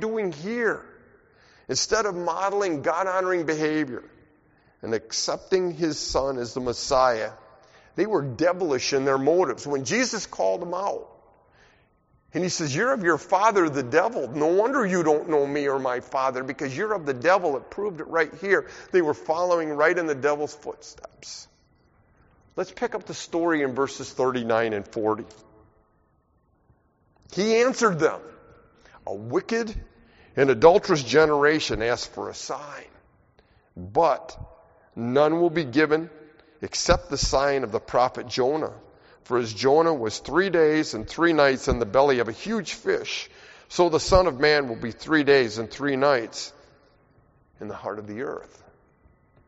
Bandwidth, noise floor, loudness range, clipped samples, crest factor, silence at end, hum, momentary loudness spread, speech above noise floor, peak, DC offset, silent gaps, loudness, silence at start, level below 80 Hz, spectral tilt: 8 kHz; -65 dBFS; 7 LU; under 0.1%; 24 dB; 1.05 s; none; 14 LU; 42 dB; -2 dBFS; under 0.1%; none; -24 LUFS; 0 s; -46 dBFS; -3.5 dB/octave